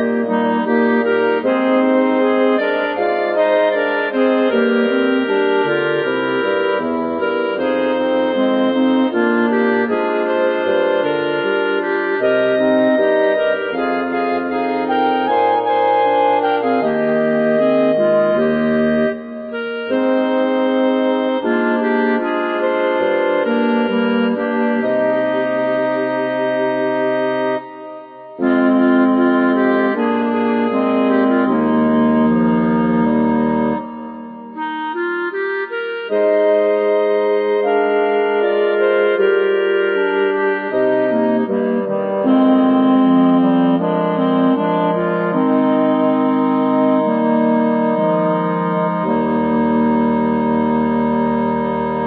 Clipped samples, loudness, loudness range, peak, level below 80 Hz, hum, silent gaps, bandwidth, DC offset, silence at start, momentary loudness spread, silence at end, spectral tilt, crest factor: under 0.1%; -16 LUFS; 3 LU; -2 dBFS; -54 dBFS; none; none; 5 kHz; under 0.1%; 0 s; 5 LU; 0 s; -10 dB/octave; 12 dB